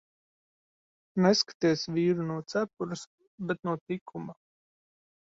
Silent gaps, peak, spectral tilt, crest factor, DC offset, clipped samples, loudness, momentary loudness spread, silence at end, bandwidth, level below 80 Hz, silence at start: 1.54-1.60 s, 3.07-3.18 s, 3.27-3.38 s, 3.81-3.86 s, 4.01-4.06 s; -10 dBFS; -5.5 dB/octave; 22 dB; under 0.1%; under 0.1%; -29 LUFS; 17 LU; 1.05 s; 7.8 kHz; -72 dBFS; 1.15 s